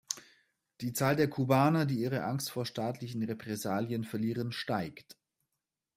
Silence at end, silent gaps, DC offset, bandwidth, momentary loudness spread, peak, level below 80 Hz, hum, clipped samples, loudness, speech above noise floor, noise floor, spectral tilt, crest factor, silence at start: 0.95 s; none; under 0.1%; 16 kHz; 11 LU; -10 dBFS; -70 dBFS; none; under 0.1%; -33 LUFS; 56 dB; -88 dBFS; -5.5 dB/octave; 22 dB; 0.1 s